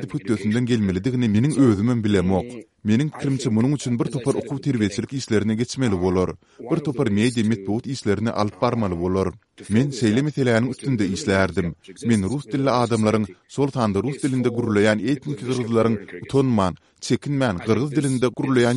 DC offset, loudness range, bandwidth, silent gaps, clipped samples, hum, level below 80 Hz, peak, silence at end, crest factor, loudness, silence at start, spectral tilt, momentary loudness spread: under 0.1%; 2 LU; 11.5 kHz; none; under 0.1%; none; -52 dBFS; -4 dBFS; 0 s; 18 dB; -22 LUFS; 0 s; -6.5 dB/octave; 6 LU